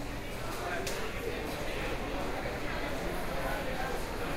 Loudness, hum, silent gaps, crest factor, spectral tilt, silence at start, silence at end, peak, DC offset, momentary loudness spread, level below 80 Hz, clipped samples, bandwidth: -36 LUFS; none; none; 14 dB; -4.5 dB/octave; 0 s; 0 s; -20 dBFS; under 0.1%; 2 LU; -42 dBFS; under 0.1%; 16 kHz